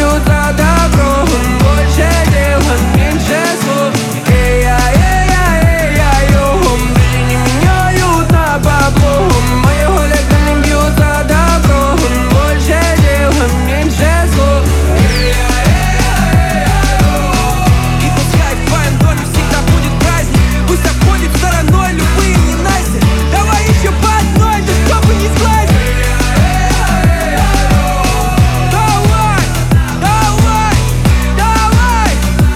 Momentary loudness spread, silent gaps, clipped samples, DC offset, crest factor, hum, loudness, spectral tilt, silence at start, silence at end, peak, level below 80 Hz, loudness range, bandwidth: 2 LU; none; under 0.1%; under 0.1%; 8 dB; none; -10 LUFS; -5 dB/octave; 0 s; 0 s; 0 dBFS; -14 dBFS; 1 LU; 16.5 kHz